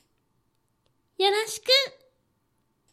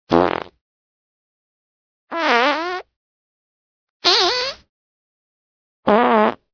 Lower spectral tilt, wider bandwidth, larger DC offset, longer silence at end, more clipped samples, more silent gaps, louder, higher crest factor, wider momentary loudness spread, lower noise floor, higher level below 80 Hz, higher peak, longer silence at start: second, 0 dB/octave vs -3.5 dB/octave; first, 15 kHz vs 5.4 kHz; neither; first, 1.05 s vs 0.2 s; neither; second, none vs 0.61-2.07 s, 2.96-4.00 s, 4.69-5.83 s; second, -23 LUFS vs -17 LUFS; about the same, 22 dB vs 22 dB; second, 7 LU vs 14 LU; second, -72 dBFS vs under -90 dBFS; second, -78 dBFS vs -56 dBFS; second, -6 dBFS vs 0 dBFS; first, 1.2 s vs 0.1 s